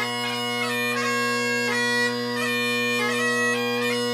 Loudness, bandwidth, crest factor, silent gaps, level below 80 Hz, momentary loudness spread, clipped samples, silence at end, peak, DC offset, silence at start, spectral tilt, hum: -23 LUFS; 15.5 kHz; 12 dB; none; -74 dBFS; 3 LU; under 0.1%; 0 s; -12 dBFS; under 0.1%; 0 s; -3 dB/octave; none